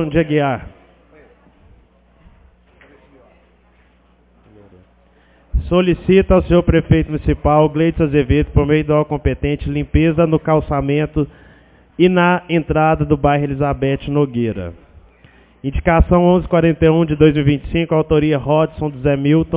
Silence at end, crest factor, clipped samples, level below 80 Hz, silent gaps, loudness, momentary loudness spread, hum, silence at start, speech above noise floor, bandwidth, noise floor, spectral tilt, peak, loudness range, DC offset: 0 s; 16 dB; under 0.1%; -28 dBFS; none; -15 LUFS; 8 LU; 60 Hz at -45 dBFS; 0 s; 38 dB; 4 kHz; -53 dBFS; -12 dB/octave; 0 dBFS; 5 LU; under 0.1%